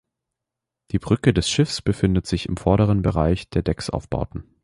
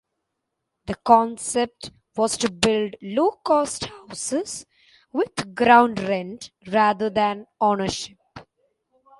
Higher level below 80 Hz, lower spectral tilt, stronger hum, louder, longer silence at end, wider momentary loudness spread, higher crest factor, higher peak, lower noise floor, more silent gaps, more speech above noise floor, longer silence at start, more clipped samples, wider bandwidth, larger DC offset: first, -36 dBFS vs -56 dBFS; first, -6 dB/octave vs -3.5 dB/octave; neither; about the same, -22 LUFS vs -22 LUFS; second, 0.2 s vs 0.8 s; second, 9 LU vs 16 LU; about the same, 18 dB vs 22 dB; second, -4 dBFS vs 0 dBFS; first, -85 dBFS vs -80 dBFS; neither; first, 64 dB vs 58 dB; about the same, 0.95 s vs 0.85 s; neither; about the same, 11.5 kHz vs 11.5 kHz; neither